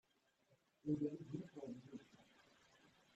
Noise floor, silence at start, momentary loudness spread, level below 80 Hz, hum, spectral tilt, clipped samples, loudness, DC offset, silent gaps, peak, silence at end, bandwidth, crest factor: -80 dBFS; 0.85 s; 19 LU; -84 dBFS; none; -8.5 dB/octave; under 0.1%; -48 LUFS; under 0.1%; none; -30 dBFS; 0.25 s; 8.2 kHz; 20 dB